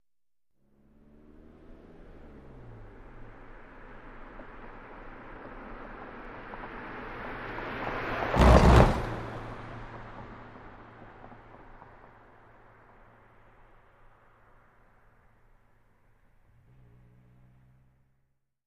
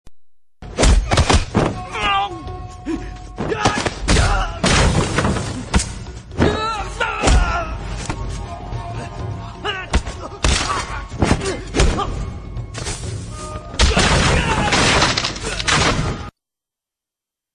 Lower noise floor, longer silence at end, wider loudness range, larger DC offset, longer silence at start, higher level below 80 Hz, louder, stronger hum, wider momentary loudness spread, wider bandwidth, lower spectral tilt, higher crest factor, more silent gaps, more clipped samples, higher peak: about the same, under -90 dBFS vs -87 dBFS; first, 6.9 s vs 1.25 s; first, 26 LU vs 6 LU; neither; first, 1.7 s vs 0.05 s; second, -36 dBFS vs -24 dBFS; second, -27 LUFS vs -19 LUFS; neither; first, 30 LU vs 14 LU; first, 12 kHz vs 10.5 kHz; first, -7 dB/octave vs -4 dB/octave; first, 28 dB vs 18 dB; neither; neither; about the same, -4 dBFS vs -2 dBFS